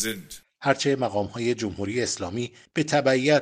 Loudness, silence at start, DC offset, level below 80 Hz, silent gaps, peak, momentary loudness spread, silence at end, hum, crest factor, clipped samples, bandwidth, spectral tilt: -25 LUFS; 0 s; under 0.1%; -60 dBFS; none; -4 dBFS; 10 LU; 0 s; none; 20 dB; under 0.1%; 15 kHz; -4.5 dB/octave